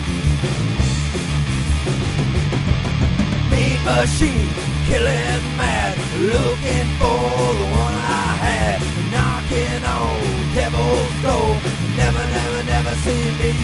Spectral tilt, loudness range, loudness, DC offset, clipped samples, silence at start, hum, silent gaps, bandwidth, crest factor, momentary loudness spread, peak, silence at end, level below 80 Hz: -5.5 dB/octave; 1 LU; -19 LUFS; under 0.1%; under 0.1%; 0 s; none; none; 11.5 kHz; 16 dB; 3 LU; -2 dBFS; 0 s; -26 dBFS